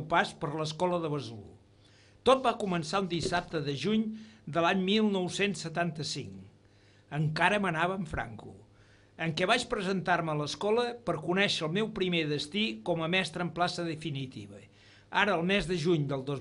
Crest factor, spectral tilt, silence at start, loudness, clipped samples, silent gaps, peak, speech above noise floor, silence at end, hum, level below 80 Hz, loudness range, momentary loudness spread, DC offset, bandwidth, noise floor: 22 dB; -5 dB/octave; 0 s; -30 LUFS; under 0.1%; none; -10 dBFS; 30 dB; 0 s; none; -58 dBFS; 3 LU; 11 LU; under 0.1%; 11 kHz; -61 dBFS